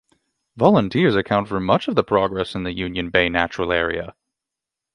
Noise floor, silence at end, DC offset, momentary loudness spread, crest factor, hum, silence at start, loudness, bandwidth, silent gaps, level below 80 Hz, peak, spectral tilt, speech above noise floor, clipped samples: -85 dBFS; 0.85 s; under 0.1%; 9 LU; 20 dB; none; 0.55 s; -20 LUFS; 10.5 kHz; none; -46 dBFS; 0 dBFS; -7 dB/octave; 66 dB; under 0.1%